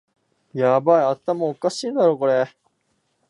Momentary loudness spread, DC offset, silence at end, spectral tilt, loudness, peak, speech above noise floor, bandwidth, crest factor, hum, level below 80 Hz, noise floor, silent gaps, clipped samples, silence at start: 8 LU; under 0.1%; 0.8 s; -6 dB/octave; -20 LUFS; -4 dBFS; 50 dB; 11 kHz; 16 dB; none; -76 dBFS; -69 dBFS; none; under 0.1%; 0.55 s